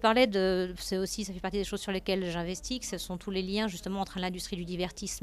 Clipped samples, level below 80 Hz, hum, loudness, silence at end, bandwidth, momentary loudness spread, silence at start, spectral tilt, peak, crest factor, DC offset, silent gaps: under 0.1%; -50 dBFS; none; -32 LUFS; 0 s; 15.5 kHz; 8 LU; 0 s; -4 dB/octave; -10 dBFS; 20 dB; under 0.1%; none